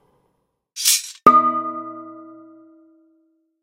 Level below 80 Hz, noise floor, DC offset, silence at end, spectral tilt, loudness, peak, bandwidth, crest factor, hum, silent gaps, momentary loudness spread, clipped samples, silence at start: -64 dBFS; -70 dBFS; under 0.1%; 1.4 s; -1 dB/octave; -16 LUFS; 0 dBFS; 16 kHz; 22 dB; none; none; 24 LU; under 0.1%; 0.75 s